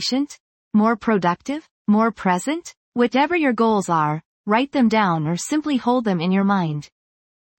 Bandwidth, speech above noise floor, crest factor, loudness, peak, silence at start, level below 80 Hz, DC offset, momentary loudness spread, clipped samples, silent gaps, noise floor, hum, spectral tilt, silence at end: 16.5 kHz; over 71 dB; 16 dB; -20 LUFS; -4 dBFS; 0 s; -62 dBFS; under 0.1%; 9 LU; under 0.1%; 0.40-0.71 s, 1.71-1.85 s, 2.77-2.92 s, 4.25-4.44 s; under -90 dBFS; none; -5.5 dB/octave; 0.75 s